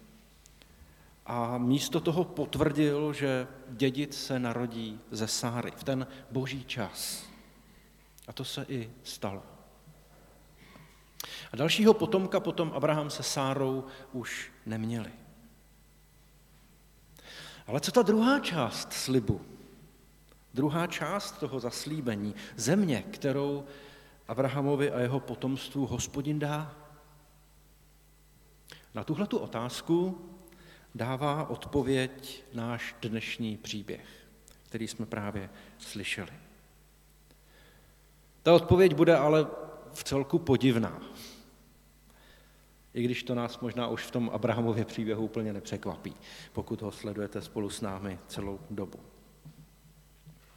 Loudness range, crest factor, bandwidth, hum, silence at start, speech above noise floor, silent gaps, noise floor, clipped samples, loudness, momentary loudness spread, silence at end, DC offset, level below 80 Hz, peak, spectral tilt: 13 LU; 24 dB; 19 kHz; none; 0.8 s; 30 dB; none; -60 dBFS; under 0.1%; -31 LUFS; 17 LU; 0.25 s; under 0.1%; -58 dBFS; -8 dBFS; -5.5 dB/octave